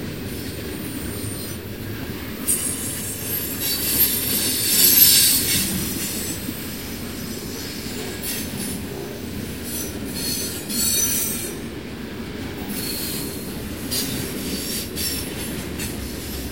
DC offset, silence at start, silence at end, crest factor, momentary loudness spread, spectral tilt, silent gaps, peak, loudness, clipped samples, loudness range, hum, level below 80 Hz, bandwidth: 0.4%; 0 s; 0 s; 24 dB; 14 LU; -2 dB/octave; none; 0 dBFS; -21 LUFS; under 0.1%; 12 LU; none; -42 dBFS; 16.5 kHz